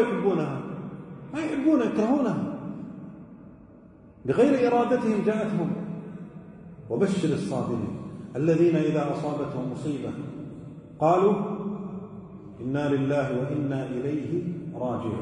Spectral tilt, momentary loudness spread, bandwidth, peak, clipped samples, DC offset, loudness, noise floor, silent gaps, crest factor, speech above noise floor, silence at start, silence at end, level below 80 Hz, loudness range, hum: -8 dB/octave; 19 LU; 10.5 kHz; -10 dBFS; under 0.1%; under 0.1%; -26 LUFS; -50 dBFS; none; 18 dB; 25 dB; 0 s; 0 s; -62 dBFS; 3 LU; none